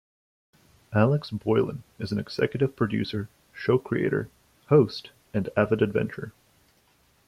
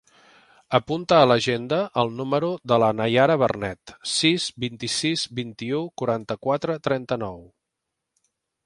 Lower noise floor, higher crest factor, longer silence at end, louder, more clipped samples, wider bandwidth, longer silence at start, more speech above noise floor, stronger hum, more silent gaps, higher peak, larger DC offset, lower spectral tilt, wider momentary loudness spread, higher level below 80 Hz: second, -64 dBFS vs -82 dBFS; about the same, 20 dB vs 22 dB; second, 1 s vs 1.2 s; second, -26 LUFS vs -23 LUFS; neither; first, 14 kHz vs 11.5 kHz; first, 0.9 s vs 0.7 s; second, 39 dB vs 59 dB; neither; neither; second, -6 dBFS vs -2 dBFS; neither; first, -8 dB/octave vs -4.5 dB/octave; first, 14 LU vs 11 LU; about the same, -60 dBFS vs -58 dBFS